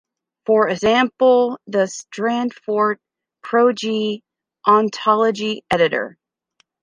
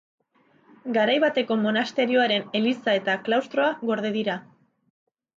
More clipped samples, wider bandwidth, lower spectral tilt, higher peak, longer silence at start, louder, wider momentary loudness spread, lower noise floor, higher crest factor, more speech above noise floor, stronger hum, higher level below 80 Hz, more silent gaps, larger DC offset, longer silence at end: neither; first, 10.5 kHz vs 7.6 kHz; about the same, -4.5 dB/octave vs -5.5 dB/octave; first, -2 dBFS vs -10 dBFS; second, 0.5 s vs 0.85 s; first, -18 LUFS vs -23 LUFS; first, 10 LU vs 7 LU; about the same, -64 dBFS vs -62 dBFS; about the same, 16 dB vs 16 dB; first, 47 dB vs 39 dB; neither; first, -58 dBFS vs -76 dBFS; neither; neither; second, 0.75 s vs 1 s